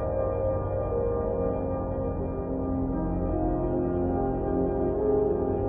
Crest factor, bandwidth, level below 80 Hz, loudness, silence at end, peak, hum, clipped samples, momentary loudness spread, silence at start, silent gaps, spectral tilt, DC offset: 12 dB; 3.4 kHz; -36 dBFS; -28 LUFS; 0 s; -14 dBFS; none; under 0.1%; 5 LU; 0 s; none; -12 dB/octave; under 0.1%